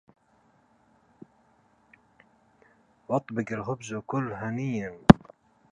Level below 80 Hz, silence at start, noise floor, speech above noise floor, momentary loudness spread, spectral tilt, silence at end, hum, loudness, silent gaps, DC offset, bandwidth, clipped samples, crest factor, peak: -46 dBFS; 3.1 s; -65 dBFS; 34 dB; 15 LU; -7.5 dB/octave; 0.55 s; none; -25 LUFS; none; under 0.1%; 10.5 kHz; under 0.1%; 28 dB; 0 dBFS